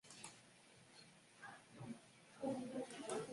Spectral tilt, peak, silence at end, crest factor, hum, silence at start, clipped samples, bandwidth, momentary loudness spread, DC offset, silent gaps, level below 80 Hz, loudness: -4.5 dB/octave; -32 dBFS; 0 s; 20 dB; none; 0.05 s; under 0.1%; 11.5 kHz; 17 LU; under 0.1%; none; -86 dBFS; -51 LUFS